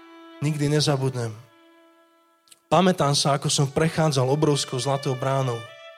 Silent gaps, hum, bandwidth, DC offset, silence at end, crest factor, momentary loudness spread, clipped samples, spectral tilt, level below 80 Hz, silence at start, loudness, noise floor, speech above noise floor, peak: none; none; 15 kHz; under 0.1%; 0.05 s; 18 dB; 9 LU; under 0.1%; -5 dB/octave; -58 dBFS; 0.1 s; -23 LUFS; -60 dBFS; 38 dB; -6 dBFS